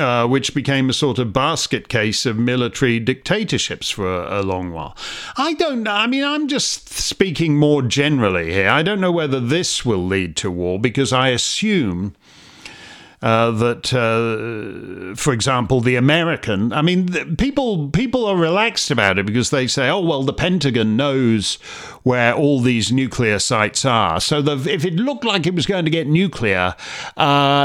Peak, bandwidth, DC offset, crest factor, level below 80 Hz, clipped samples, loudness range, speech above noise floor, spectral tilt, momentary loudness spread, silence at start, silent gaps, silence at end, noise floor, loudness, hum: 0 dBFS; 16 kHz; under 0.1%; 18 dB; -44 dBFS; under 0.1%; 3 LU; 23 dB; -4.5 dB/octave; 7 LU; 0 s; none; 0 s; -41 dBFS; -18 LUFS; none